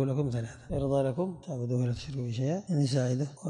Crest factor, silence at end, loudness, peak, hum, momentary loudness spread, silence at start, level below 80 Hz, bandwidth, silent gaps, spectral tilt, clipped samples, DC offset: 12 dB; 0 s; -31 LUFS; -18 dBFS; none; 7 LU; 0 s; -52 dBFS; 10.5 kHz; none; -7.5 dB/octave; under 0.1%; under 0.1%